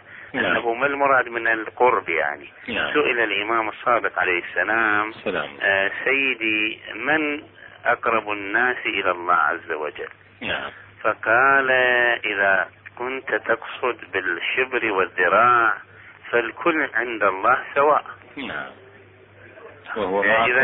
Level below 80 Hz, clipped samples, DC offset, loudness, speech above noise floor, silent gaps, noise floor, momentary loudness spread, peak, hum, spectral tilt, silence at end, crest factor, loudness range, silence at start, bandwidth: -60 dBFS; under 0.1%; under 0.1%; -21 LUFS; 27 dB; none; -48 dBFS; 12 LU; -6 dBFS; none; -7.5 dB/octave; 0 s; 16 dB; 3 LU; 0.1 s; 4.2 kHz